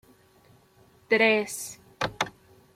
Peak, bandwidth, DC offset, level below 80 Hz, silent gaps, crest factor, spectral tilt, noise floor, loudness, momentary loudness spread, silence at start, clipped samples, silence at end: -8 dBFS; 16 kHz; under 0.1%; -62 dBFS; none; 22 dB; -3 dB/octave; -59 dBFS; -26 LUFS; 14 LU; 1.1 s; under 0.1%; 0.45 s